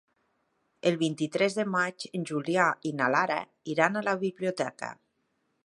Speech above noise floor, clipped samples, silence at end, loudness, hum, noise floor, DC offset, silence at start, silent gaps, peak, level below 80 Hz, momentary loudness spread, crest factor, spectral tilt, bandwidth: 47 dB; under 0.1%; 0.7 s; -28 LUFS; none; -76 dBFS; under 0.1%; 0.85 s; none; -6 dBFS; -78 dBFS; 8 LU; 24 dB; -5 dB/octave; 11.5 kHz